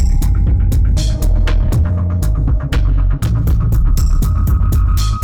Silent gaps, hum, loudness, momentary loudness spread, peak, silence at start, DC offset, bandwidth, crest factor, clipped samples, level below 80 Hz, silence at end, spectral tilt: none; none; -15 LUFS; 2 LU; -6 dBFS; 0 s; 0.5%; 17 kHz; 6 dB; under 0.1%; -14 dBFS; 0 s; -6.5 dB/octave